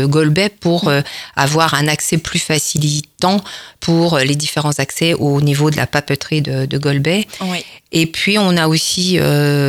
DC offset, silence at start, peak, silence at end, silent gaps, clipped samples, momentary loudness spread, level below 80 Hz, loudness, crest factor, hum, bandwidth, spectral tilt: under 0.1%; 0 s; 0 dBFS; 0 s; none; under 0.1%; 5 LU; -46 dBFS; -15 LUFS; 14 dB; none; 16.5 kHz; -4.5 dB/octave